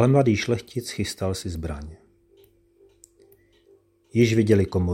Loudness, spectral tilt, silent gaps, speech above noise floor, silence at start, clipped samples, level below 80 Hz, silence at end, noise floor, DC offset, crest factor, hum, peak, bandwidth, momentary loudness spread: -23 LUFS; -6.5 dB/octave; none; 37 dB; 0 s; under 0.1%; -46 dBFS; 0 s; -59 dBFS; under 0.1%; 20 dB; none; -6 dBFS; 16.5 kHz; 14 LU